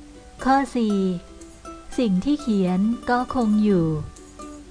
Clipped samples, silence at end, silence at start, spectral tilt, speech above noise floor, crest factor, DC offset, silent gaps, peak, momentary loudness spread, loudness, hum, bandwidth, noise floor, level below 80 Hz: under 0.1%; 0 s; 0 s; -7 dB/octave; 20 dB; 16 dB; under 0.1%; none; -6 dBFS; 20 LU; -22 LUFS; none; 10.5 kHz; -40 dBFS; -44 dBFS